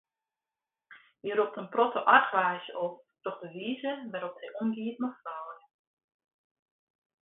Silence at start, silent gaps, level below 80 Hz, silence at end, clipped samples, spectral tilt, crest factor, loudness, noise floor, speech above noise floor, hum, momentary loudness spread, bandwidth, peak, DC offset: 0.9 s; none; -84 dBFS; 1.7 s; under 0.1%; -2 dB/octave; 26 dB; -30 LUFS; under -90 dBFS; over 60 dB; none; 18 LU; 4 kHz; -8 dBFS; under 0.1%